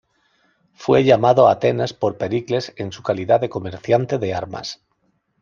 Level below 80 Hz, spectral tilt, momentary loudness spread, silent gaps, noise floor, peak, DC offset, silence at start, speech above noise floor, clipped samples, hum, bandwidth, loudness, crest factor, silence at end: -58 dBFS; -6.5 dB/octave; 15 LU; none; -67 dBFS; 0 dBFS; under 0.1%; 0.8 s; 49 dB; under 0.1%; none; 7.2 kHz; -19 LUFS; 18 dB; 0.65 s